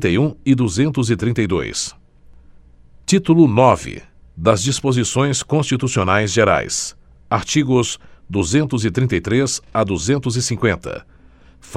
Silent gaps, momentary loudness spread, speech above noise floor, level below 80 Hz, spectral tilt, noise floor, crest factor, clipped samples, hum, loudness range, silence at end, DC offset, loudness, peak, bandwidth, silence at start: none; 10 LU; 29 dB; -42 dBFS; -5 dB/octave; -46 dBFS; 18 dB; under 0.1%; none; 3 LU; 0 s; under 0.1%; -17 LUFS; 0 dBFS; 13 kHz; 0 s